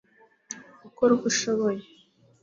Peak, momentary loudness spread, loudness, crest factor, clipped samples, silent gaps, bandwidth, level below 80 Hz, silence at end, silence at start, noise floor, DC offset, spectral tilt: -10 dBFS; 18 LU; -25 LUFS; 18 dB; under 0.1%; none; 7.6 kHz; -70 dBFS; 0.6 s; 0.5 s; -59 dBFS; under 0.1%; -3.5 dB/octave